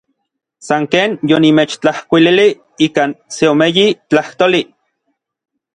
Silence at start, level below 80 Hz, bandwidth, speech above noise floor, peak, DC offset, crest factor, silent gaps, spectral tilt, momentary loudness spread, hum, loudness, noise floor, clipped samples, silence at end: 0.65 s; -56 dBFS; 10 kHz; 60 dB; 0 dBFS; under 0.1%; 14 dB; none; -5 dB/octave; 7 LU; none; -13 LUFS; -72 dBFS; under 0.1%; 1.1 s